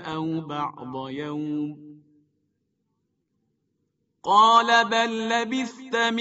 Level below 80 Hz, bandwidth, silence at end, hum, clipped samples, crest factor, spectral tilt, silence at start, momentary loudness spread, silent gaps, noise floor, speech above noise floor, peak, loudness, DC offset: -72 dBFS; 8 kHz; 0 s; none; under 0.1%; 20 dB; -1.5 dB/octave; 0 s; 17 LU; none; -75 dBFS; 52 dB; -6 dBFS; -23 LUFS; under 0.1%